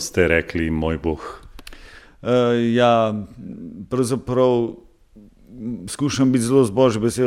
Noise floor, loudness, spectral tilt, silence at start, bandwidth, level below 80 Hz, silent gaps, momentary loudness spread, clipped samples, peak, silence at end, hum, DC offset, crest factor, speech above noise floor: -48 dBFS; -19 LUFS; -5.5 dB/octave; 0 s; 15 kHz; -42 dBFS; none; 18 LU; under 0.1%; -2 dBFS; 0 s; none; under 0.1%; 18 dB; 29 dB